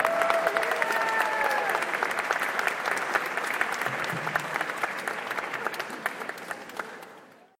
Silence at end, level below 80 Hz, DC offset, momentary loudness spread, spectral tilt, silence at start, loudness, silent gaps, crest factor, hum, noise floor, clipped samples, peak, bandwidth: 0.25 s; -72 dBFS; under 0.1%; 11 LU; -2.5 dB/octave; 0 s; -28 LUFS; none; 24 dB; none; -51 dBFS; under 0.1%; -6 dBFS; 17 kHz